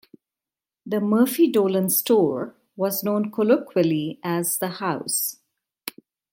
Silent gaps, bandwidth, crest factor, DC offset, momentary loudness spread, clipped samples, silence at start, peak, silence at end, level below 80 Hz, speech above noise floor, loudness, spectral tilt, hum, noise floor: none; 17 kHz; 18 dB; under 0.1%; 13 LU; under 0.1%; 0.85 s; -4 dBFS; 0.45 s; -72 dBFS; over 68 dB; -22 LUFS; -5 dB/octave; none; under -90 dBFS